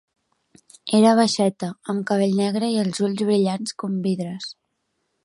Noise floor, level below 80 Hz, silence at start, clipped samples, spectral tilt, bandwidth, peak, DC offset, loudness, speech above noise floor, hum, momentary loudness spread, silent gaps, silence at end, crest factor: -74 dBFS; -70 dBFS; 0.85 s; under 0.1%; -5.5 dB/octave; 11.5 kHz; -4 dBFS; under 0.1%; -21 LUFS; 53 dB; none; 14 LU; none; 0.75 s; 18 dB